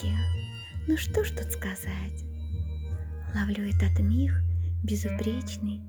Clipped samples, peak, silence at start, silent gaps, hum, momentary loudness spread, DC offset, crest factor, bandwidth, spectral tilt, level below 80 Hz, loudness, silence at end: under 0.1%; -14 dBFS; 0 s; none; none; 10 LU; under 0.1%; 14 dB; over 20 kHz; -6.5 dB/octave; -40 dBFS; -30 LUFS; 0 s